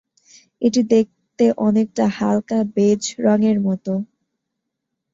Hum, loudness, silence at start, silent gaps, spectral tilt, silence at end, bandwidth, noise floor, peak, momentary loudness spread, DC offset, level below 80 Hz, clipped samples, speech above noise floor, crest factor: none; -19 LUFS; 0.6 s; none; -6 dB/octave; 1.1 s; 7.8 kHz; -79 dBFS; -4 dBFS; 8 LU; under 0.1%; -60 dBFS; under 0.1%; 61 dB; 16 dB